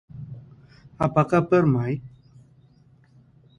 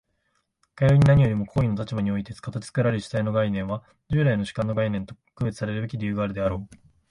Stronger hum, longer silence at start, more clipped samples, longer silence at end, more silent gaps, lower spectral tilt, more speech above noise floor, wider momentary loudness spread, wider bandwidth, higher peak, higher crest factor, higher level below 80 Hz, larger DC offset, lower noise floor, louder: neither; second, 0.15 s vs 0.75 s; neither; first, 1.5 s vs 0.45 s; neither; about the same, -9 dB/octave vs -8 dB/octave; second, 35 dB vs 49 dB; first, 21 LU vs 14 LU; second, 9.8 kHz vs 11 kHz; about the same, -4 dBFS vs -6 dBFS; about the same, 22 dB vs 18 dB; second, -54 dBFS vs -46 dBFS; neither; second, -56 dBFS vs -73 dBFS; about the same, -22 LUFS vs -24 LUFS